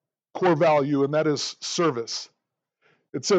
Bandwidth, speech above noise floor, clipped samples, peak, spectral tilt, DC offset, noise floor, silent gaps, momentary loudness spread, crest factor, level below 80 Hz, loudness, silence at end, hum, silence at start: 9 kHz; 55 dB; under 0.1%; -10 dBFS; -4.5 dB/octave; under 0.1%; -78 dBFS; 3.09-3.13 s; 15 LU; 14 dB; -82 dBFS; -24 LUFS; 0 s; none; 0.35 s